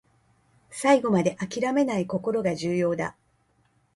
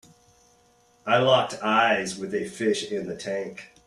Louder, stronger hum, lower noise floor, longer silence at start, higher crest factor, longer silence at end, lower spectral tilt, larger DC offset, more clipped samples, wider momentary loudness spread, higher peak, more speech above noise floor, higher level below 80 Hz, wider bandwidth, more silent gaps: about the same, -25 LUFS vs -24 LUFS; neither; first, -67 dBFS vs -61 dBFS; second, 0.7 s vs 1.05 s; about the same, 20 dB vs 20 dB; first, 0.85 s vs 0.2 s; first, -6 dB/octave vs -4 dB/octave; neither; neither; about the same, 9 LU vs 11 LU; about the same, -6 dBFS vs -6 dBFS; first, 42 dB vs 36 dB; about the same, -64 dBFS vs -66 dBFS; about the same, 11.5 kHz vs 12.5 kHz; neither